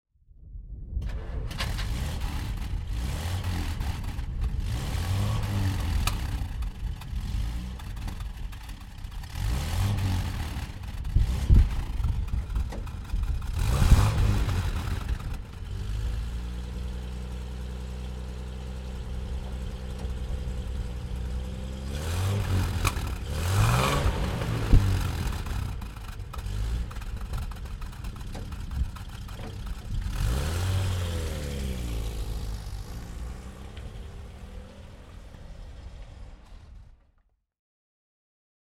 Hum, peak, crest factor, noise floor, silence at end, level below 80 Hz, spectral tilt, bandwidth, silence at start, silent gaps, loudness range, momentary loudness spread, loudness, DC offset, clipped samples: none; -6 dBFS; 24 dB; -67 dBFS; 1.8 s; -32 dBFS; -5.5 dB/octave; 16.5 kHz; 0.4 s; none; 12 LU; 16 LU; -31 LUFS; under 0.1%; under 0.1%